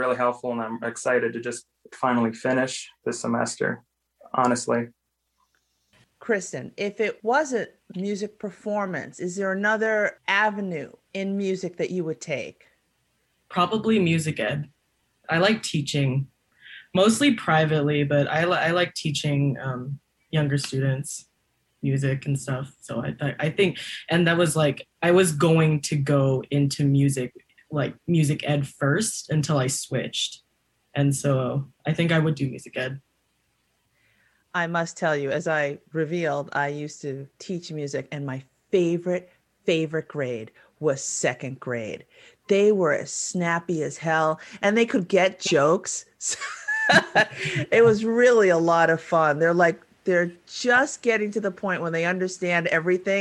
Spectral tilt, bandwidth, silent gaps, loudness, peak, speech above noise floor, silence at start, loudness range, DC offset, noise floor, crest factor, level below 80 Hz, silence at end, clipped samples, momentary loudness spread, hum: -5 dB/octave; 12.5 kHz; none; -24 LUFS; -4 dBFS; 49 dB; 0 s; 8 LU; under 0.1%; -72 dBFS; 20 dB; -64 dBFS; 0 s; under 0.1%; 13 LU; none